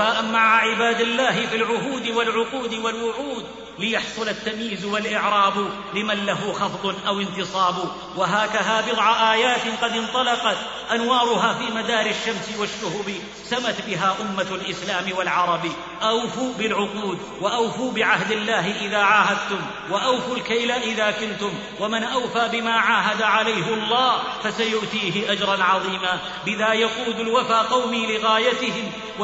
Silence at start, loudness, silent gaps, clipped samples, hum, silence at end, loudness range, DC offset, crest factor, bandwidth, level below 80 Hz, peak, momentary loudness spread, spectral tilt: 0 s; -21 LUFS; none; under 0.1%; none; 0 s; 4 LU; under 0.1%; 18 dB; 8 kHz; -58 dBFS; -4 dBFS; 8 LU; -3 dB/octave